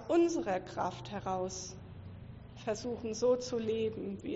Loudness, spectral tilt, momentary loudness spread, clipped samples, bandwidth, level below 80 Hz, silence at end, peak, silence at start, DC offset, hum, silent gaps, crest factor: -35 LUFS; -5.5 dB/octave; 18 LU; under 0.1%; 8 kHz; -60 dBFS; 0 s; -20 dBFS; 0 s; under 0.1%; none; none; 16 dB